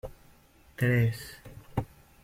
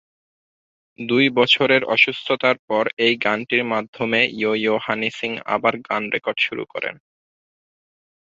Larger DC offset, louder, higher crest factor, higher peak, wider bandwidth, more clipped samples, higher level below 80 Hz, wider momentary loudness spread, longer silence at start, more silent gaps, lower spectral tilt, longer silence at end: neither; second, -30 LUFS vs -19 LUFS; about the same, 18 dB vs 20 dB; second, -14 dBFS vs -2 dBFS; first, 16 kHz vs 7.8 kHz; neither; first, -52 dBFS vs -66 dBFS; first, 22 LU vs 9 LU; second, 0.05 s vs 1 s; second, none vs 2.59-2.68 s, 2.93-2.97 s, 3.88-3.93 s; first, -7 dB/octave vs -5 dB/octave; second, 0.4 s vs 1.35 s